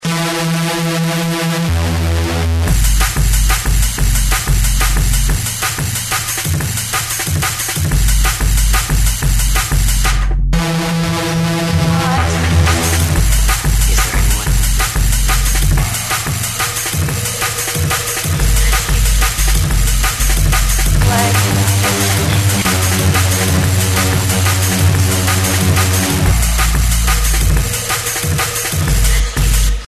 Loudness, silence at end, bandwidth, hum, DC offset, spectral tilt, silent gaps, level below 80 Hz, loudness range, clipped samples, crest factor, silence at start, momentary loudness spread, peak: -14 LUFS; 0 s; 14 kHz; none; under 0.1%; -3.5 dB/octave; none; -16 dBFS; 3 LU; under 0.1%; 12 dB; 0 s; 4 LU; 0 dBFS